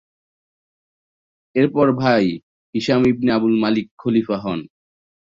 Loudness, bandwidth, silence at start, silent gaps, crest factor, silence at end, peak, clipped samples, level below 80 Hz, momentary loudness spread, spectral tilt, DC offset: -19 LUFS; 7.6 kHz; 1.55 s; 2.43-2.73 s, 3.91-3.98 s; 16 dB; 0.7 s; -4 dBFS; under 0.1%; -56 dBFS; 10 LU; -7.5 dB/octave; under 0.1%